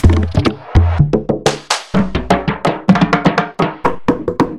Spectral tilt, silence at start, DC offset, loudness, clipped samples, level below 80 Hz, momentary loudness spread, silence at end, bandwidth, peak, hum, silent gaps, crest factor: -6 dB/octave; 0 s; under 0.1%; -15 LUFS; under 0.1%; -24 dBFS; 5 LU; 0 s; 12 kHz; 0 dBFS; none; none; 14 dB